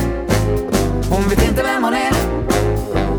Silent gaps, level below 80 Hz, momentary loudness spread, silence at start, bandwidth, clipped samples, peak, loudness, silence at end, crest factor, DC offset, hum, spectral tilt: none; -24 dBFS; 3 LU; 0 s; over 20 kHz; under 0.1%; -2 dBFS; -17 LUFS; 0 s; 14 dB; under 0.1%; none; -5.5 dB/octave